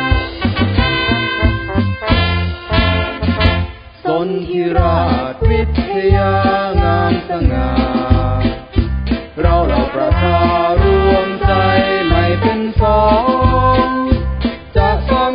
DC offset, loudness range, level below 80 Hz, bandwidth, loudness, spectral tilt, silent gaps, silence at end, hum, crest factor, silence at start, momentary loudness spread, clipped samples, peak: under 0.1%; 3 LU; -20 dBFS; 5.2 kHz; -14 LUFS; -10.5 dB/octave; none; 0 s; none; 14 dB; 0 s; 6 LU; under 0.1%; 0 dBFS